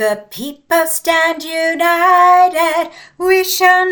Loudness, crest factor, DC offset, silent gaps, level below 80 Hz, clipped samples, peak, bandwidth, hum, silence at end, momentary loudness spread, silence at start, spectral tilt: -13 LUFS; 14 dB; under 0.1%; none; -56 dBFS; under 0.1%; 0 dBFS; 19.5 kHz; none; 0 s; 13 LU; 0 s; -1.5 dB/octave